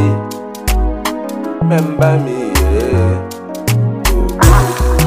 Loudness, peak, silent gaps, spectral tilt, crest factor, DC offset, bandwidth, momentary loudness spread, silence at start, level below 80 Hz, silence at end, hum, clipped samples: -14 LUFS; 0 dBFS; none; -6 dB/octave; 12 dB; 0.2%; 16 kHz; 10 LU; 0 s; -18 dBFS; 0 s; none; under 0.1%